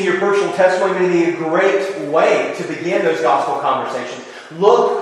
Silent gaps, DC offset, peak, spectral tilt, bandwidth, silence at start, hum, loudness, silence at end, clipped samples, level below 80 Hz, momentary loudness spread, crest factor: none; under 0.1%; 0 dBFS; -5 dB/octave; 11.5 kHz; 0 s; none; -16 LUFS; 0 s; under 0.1%; -68 dBFS; 9 LU; 16 dB